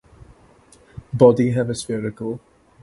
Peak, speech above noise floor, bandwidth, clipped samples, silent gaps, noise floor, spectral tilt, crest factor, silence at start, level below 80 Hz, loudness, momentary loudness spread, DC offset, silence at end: 0 dBFS; 33 dB; 11.5 kHz; under 0.1%; none; -51 dBFS; -7 dB/octave; 22 dB; 1.15 s; -52 dBFS; -19 LUFS; 17 LU; under 0.1%; 0.45 s